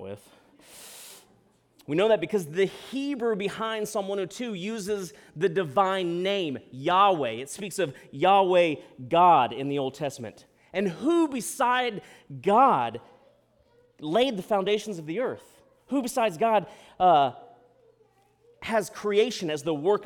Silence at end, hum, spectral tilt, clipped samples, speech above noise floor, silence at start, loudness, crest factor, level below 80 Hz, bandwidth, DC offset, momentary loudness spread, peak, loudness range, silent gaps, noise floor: 0 s; none; -4.5 dB/octave; under 0.1%; 38 dB; 0 s; -26 LUFS; 18 dB; -68 dBFS; 19 kHz; under 0.1%; 19 LU; -8 dBFS; 5 LU; none; -64 dBFS